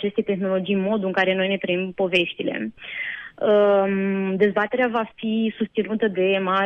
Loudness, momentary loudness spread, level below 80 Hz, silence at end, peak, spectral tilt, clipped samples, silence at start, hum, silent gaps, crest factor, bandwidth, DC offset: -22 LUFS; 9 LU; -64 dBFS; 0 s; -6 dBFS; -7.5 dB/octave; under 0.1%; 0 s; none; none; 16 dB; 8.2 kHz; under 0.1%